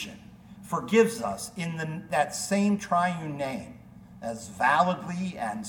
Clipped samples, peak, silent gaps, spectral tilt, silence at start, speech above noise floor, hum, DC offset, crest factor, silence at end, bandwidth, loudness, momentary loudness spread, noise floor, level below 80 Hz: under 0.1%; -8 dBFS; none; -5 dB/octave; 0 s; 21 dB; none; under 0.1%; 20 dB; 0 s; 18.5 kHz; -27 LUFS; 15 LU; -48 dBFS; -62 dBFS